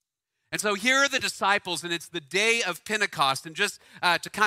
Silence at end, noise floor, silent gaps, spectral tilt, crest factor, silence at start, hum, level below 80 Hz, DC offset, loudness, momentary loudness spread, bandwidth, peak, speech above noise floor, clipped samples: 0 s; -80 dBFS; none; -1.5 dB/octave; 20 dB; 0.5 s; none; -70 dBFS; under 0.1%; -25 LUFS; 8 LU; 16 kHz; -6 dBFS; 54 dB; under 0.1%